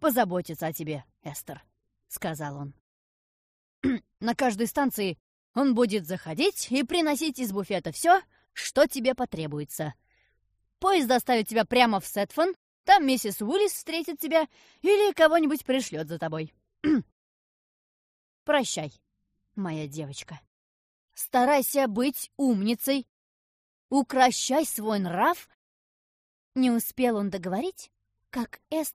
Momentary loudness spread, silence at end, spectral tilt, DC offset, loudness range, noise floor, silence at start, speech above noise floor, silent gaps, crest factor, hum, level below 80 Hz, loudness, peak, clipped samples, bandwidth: 14 LU; 0.05 s; -4 dB/octave; under 0.1%; 9 LU; -77 dBFS; 0 s; 51 dB; 2.80-3.82 s, 5.20-5.54 s, 12.56-12.84 s, 17.12-18.46 s, 20.47-21.08 s, 23.09-23.89 s, 25.54-26.52 s; 22 dB; none; -64 dBFS; -26 LUFS; -6 dBFS; under 0.1%; 15.5 kHz